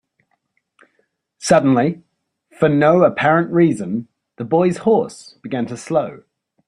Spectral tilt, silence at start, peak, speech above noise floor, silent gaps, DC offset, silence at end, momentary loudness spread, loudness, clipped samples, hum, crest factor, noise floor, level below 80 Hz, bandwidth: -6.5 dB/octave; 1.4 s; -2 dBFS; 52 dB; none; under 0.1%; 0.5 s; 15 LU; -17 LUFS; under 0.1%; none; 18 dB; -68 dBFS; -58 dBFS; 11.5 kHz